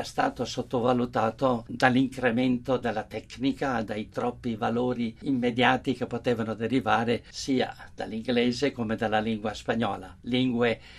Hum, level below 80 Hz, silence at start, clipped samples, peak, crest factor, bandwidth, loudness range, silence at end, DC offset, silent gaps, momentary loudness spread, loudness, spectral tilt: none; -54 dBFS; 0 s; under 0.1%; -4 dBFS; 24 dB; 12 kHz; 2 LU; 0 s; under 0.1%; none; 8 LU; -27 LUFS; -5.5 dB/octave